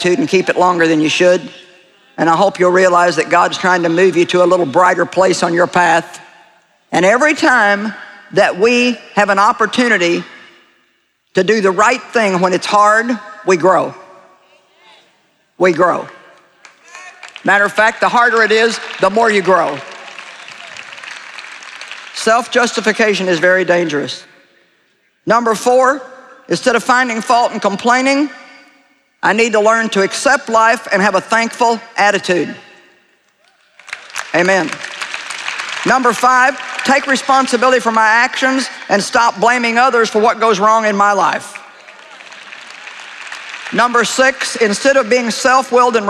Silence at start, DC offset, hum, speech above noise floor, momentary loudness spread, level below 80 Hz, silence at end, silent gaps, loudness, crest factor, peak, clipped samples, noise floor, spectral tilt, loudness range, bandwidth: 0 s; under 0.1%; none; 48 dB; 18 LU; -60 dBFS; 0 s; none; -12 LUFS; 14 dB; 0 dBFS; under 0.1%; -60 dBFS; -3.5 dB/octave; 6 LU; 13.5 kHz